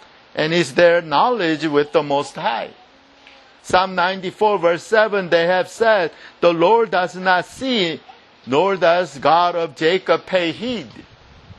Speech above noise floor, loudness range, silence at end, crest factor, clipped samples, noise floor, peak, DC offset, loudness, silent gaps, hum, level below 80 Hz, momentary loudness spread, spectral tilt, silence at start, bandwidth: 30 dB; 3 LU; 0.05 s; 18 dB; under 0.1%; -48 dBFS; 0 dBFS; under 0.1%; -18 LUFS; none; none; -58 dBFS; 8 LU; -4.5 dB/octave; 0.35 s; 11.5 kHz